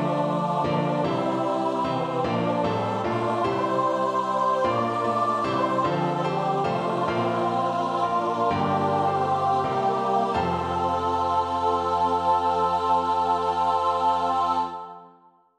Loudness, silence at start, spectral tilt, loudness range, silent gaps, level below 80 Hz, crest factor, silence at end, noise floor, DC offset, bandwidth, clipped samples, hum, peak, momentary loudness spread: -24 LUFS; 0 s; -6.5 dB/octave; 2 LU; none; -56 dBFS; 14 dB; 0.5 s; -56 dBFS; under 0.1%; 12 kHz; under 0.1%; none; -10 dBFS; 3 LU